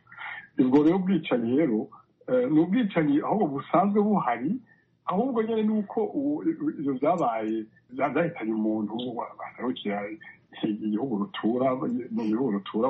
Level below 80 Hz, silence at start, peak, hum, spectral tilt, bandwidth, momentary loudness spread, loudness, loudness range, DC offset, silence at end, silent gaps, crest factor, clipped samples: -70 dBFS; 0.1 s; -8 dBFS; none; -6.5 dB/octave; 5.8 kHz; 11 LU; -27 LUFS; 6 LU; under 0.1%; 0 s; none; 18 dB; under 0.1%